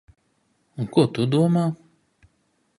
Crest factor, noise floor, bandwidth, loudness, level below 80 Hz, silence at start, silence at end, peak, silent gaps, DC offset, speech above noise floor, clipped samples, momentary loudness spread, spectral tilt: 22 dB; -68 dBFS; 11.5 kHz; -22 LUFS; -62 dBFS; 0.8 s; 1.05 s; -2 dBFS; none; under 0.1%; 48 dB; under 0.1%; 18 LU; -8 dB/octave